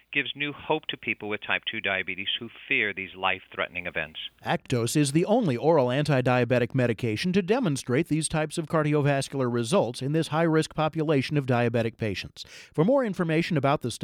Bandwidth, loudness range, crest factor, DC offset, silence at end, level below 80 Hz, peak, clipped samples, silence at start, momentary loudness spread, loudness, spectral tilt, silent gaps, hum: 15 kHz; 4 LU; 18 dB; under 0.1%; 0 s; -58 dBFS; -8 dBFS; under 0.1%; 0.1 s; 8 LU; -26 LUFS; -5.5 dB/octave; none; none